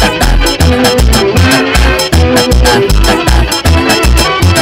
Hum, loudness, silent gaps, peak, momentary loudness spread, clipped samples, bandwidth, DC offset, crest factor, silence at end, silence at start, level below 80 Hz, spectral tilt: none; -8 LUFS; none; 0 dBFS; 2 LU; 0.6%; 16.5 kHz; under 0.1%; 8 dB; 0 s; 0 s; -12 dBFS; -4.5 dB/octave